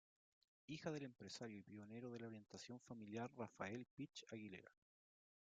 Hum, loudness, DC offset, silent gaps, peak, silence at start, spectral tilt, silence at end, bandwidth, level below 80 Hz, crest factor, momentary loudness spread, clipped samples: none; -54 LUFS; under 0.1%; 3.91-3.97 s; -34 dBFS; 0.7 s; -5 dB/octave; 0.75 s; 9 kHz; -88 dBFS; 22 dB; 7 LU; under 0.1%